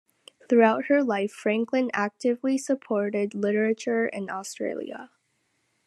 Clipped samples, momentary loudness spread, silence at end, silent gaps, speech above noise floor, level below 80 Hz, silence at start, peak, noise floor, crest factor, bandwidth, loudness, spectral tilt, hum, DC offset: under 0.1%; 12 LU; 0.8 s; none; 48 dB; -82 dBFS; 0.5 s; -6 dBFS; -73 dBFS; 20 dB; 12.5 kHz; -25 LUFS; -5.5 dB/octave; none; under 0.1%